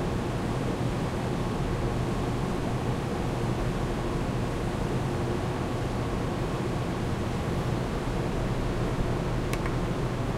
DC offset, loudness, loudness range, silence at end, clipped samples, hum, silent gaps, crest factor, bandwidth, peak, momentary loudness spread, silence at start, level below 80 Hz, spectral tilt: under 0.1%; -30 LUFS; 0 LU; 0 s; under 0.1%; none; none; 16 dB; 15 kHz; -12 dBFS; 1 LU; 0 s; -36 dBFS; -6.5 dB/octave